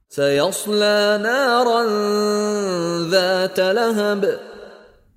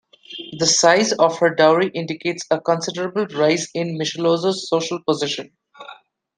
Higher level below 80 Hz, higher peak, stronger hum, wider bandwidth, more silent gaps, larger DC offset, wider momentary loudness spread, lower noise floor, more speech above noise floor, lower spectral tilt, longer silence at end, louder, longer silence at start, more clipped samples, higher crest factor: about the same, -64 dBFS vs -66 dBFS; about the same, -2 dBFS vs -2 dBFS; neither; first, 16 kHz vs 10.5 kHz; neither; neither; second, 5 LU vs 10 LU; about the same, -45 dBFS vs -44 dBFS; about the same, 27 dB vs 25 dB; about the same, -4 dB/octave vs -3.5 dB/octave; about the same, 0.45 s vs 0.45 s; about the same, -18 LUFS vs -19 LUFS; second, 0.1 s vs 0.3 s; neither; about the same, 16 dB vs 18 dB